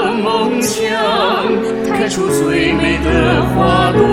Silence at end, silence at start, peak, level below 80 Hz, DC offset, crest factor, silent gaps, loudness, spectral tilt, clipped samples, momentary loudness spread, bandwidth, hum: 0 s; 0 s; 0 dBFS; -30 dBFS; under 0.1%; 14 dB; none; -14 LUFS; -5 dB/octave; under 0.1%; 4 LU; 17 kHz; none